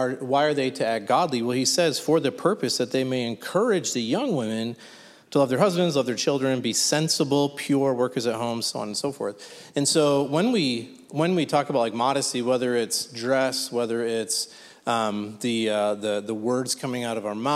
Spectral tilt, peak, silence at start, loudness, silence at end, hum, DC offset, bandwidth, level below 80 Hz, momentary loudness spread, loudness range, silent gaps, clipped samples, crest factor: -4 dB/octave; -6 dBFS; 0 s; -24 LUFS; 0 s; none; under 0.1%; 15.5 kHz; -74 dBFS; 7 LU; 3 LU; none; under 0.1%; 18 dB